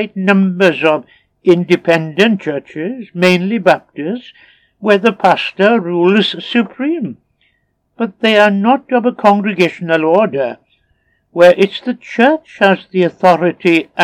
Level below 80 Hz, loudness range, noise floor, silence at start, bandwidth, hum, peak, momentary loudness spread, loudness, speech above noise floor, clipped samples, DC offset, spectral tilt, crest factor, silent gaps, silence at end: -64 dBFS; 2 LU; -62 dBFS; 0 s; 12.5 kHz; none; 0 dBFS; 12 LU; -13 LUFS; 50 dB; 0.2%; under 0.1%; -6.5 dB/octave; 14 dB; none; 0 s